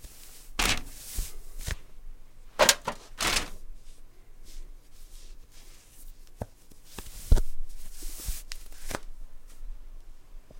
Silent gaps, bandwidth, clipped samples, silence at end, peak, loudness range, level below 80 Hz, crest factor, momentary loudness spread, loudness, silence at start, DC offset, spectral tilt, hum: none; 16.5 kHz; under 0.1%; 0 s; -4 dBFS; 20 LU; -36 dBFS; 26 dB; 25 LU; -30 LUFS; 0 s; under 0.1%; -2 dB/octave; none